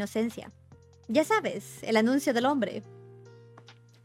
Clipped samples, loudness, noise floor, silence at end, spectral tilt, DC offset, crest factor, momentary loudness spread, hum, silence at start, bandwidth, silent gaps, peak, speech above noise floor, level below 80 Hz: under 0.1%; -28 LUFS; -54 dBFS; 0.3 s; -4.5 dB/octave; under 0.1%; 20 dB; 15 LU; none; 0 s; 16.5 kHz; none; -10 dBFS; 26 dB; -70 dBFS